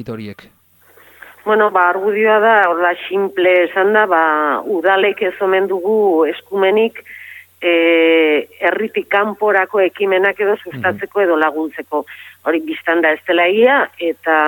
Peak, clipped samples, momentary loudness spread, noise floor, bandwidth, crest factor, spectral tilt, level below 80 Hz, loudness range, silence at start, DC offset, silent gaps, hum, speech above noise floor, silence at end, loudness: -2 dBFS; under 0.1%; 11 LU; -48 dBFS; 17.5 kHz; 14 dB; -6 dB/octave; -70 dBFS; 3 LU; 0 s; under 0.1%; none; none; 34 dB; 0 s; -14 LUFS